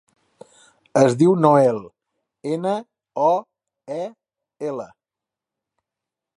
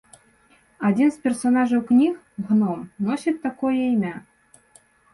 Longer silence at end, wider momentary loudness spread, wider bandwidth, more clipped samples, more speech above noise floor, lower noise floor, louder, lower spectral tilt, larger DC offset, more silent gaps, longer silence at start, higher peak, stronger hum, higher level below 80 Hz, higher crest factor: first, 1.5 s vs 0.95 s; first, 18 LU vs 8 LU; about the same, 11.5 kHz vs 11.5 kHz; neither; first, 69 dB vs 37 dB; first, -88 dBFS vs -58 dBFS; about the same, -20 LUFS vs -22 LUFS; about the same, -7 dB/octave vs -7 dB/octave; neither; neither; first, 0.95 s vs 0.8 s; first, -2 dBFS vs -10 dBFS; neither; second, -70 dBFS vs -64 dBFS; first, 22 dB vs 14 dB